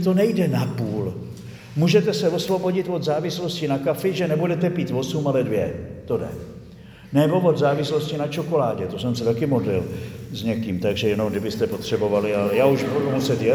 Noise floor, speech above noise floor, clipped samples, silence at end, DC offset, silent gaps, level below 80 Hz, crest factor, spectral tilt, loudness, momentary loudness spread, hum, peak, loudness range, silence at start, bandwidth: -43 dBFS; 21 dB; under 0.1%; 0 s; under 0.1%; none; -52 dBFS; 18 dB; -6.5 dB/octave; -22 LUFS; 10 LU; none; -4 dBFS; 2 LU; 0 s; over 20 kHz